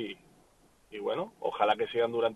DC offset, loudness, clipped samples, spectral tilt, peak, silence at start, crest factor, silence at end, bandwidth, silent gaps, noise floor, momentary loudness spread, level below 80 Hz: under 0.1%; -31 LUFS; under 0.1%; -5.5 dB/octave; -12 dBFS; 0 s; 20 dB; 0 s; 12 kHz; none; -64 dBFS; 16 LU; -70 dBFS